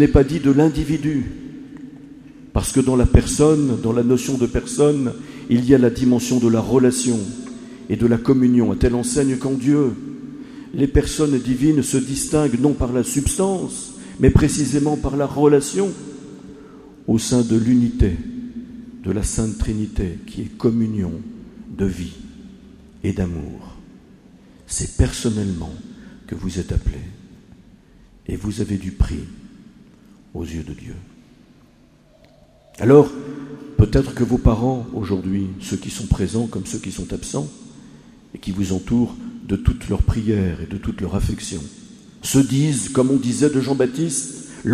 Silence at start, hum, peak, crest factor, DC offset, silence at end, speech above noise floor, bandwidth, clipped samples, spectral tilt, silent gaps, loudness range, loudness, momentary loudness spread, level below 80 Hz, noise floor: 0 s; none; 0 dBFS; 20 dB; under 0.1%; 0 s; 33 dB; 15 kHz; under 0.1%; -6 dB/octave; none; 11 LU; -19 LUFS; 18 LU; -30 dBFS; -52 dBFS